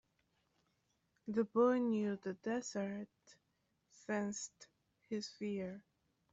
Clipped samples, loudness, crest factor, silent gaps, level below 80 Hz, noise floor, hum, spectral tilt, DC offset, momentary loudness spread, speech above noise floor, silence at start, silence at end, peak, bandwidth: under 0.1%; -39 LUFS; 20 dB; none; -82 dBFS; -82 dBFS; none; -5 dB/octave; under 0.1%; 18 LU; 44 dB; 1.25 s; 0.5 s; -20 dBFS; 8 kHz